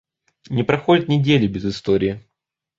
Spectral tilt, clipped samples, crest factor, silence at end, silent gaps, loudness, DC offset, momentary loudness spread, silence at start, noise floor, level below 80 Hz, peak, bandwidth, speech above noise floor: -7.5 dB/octave; under 0.1%; 18 dB; 0.6 s; none; -19 LUFS; under 0.1%; 9 LU; 0.5 s; -80 dBFS; -48 dBFS; -2 dBFS; 7.6 kHz; 62 dB